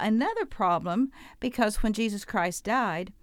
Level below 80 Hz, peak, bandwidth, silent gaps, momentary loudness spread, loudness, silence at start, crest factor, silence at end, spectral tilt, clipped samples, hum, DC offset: -42 dBFS; -10 dBFS; 16.5 kHz; none; 5 LU; -28 LUFS; 0 s; 18 dB; 0.1 s; -5 dB/octave; under 0.1%; none; under 0.1%